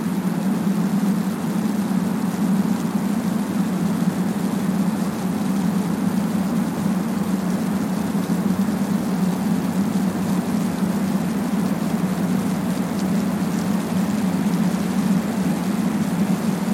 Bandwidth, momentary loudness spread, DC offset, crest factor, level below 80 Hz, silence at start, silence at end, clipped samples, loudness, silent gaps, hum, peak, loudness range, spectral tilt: 16.5 kHz; 2 LU; under 0.1%; 12 dB; -52 dBFS; 0 s; 0 s; under 0.1%; -22 LUFS; none; none; -8 dBFS; 1 LU; -6.5 dB/octave